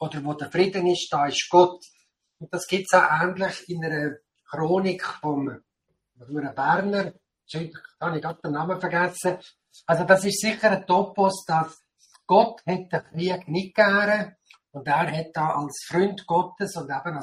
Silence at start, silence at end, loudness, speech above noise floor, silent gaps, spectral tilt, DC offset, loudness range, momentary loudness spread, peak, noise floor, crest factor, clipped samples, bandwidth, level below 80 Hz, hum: 0 s; 0 s; -24 LUFS; 52 dB; none; -5 dB/octave; under 0.1%; 6 LU; 15 LU; -4 dBFS; -75 dBFS; 20 dB; under 0.1%; 15 kHz; -68 dBFS; none